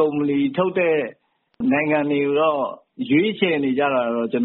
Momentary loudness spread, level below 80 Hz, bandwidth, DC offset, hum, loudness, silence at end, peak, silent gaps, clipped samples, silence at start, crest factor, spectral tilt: 7 LU; -64 dBFS; 4.2 kHz; under 0.1%; none; -20 LUFS; 0 s; -6 dBFS; none; under 0.1%; 0 s; 14 dB; -4.5 dB/octave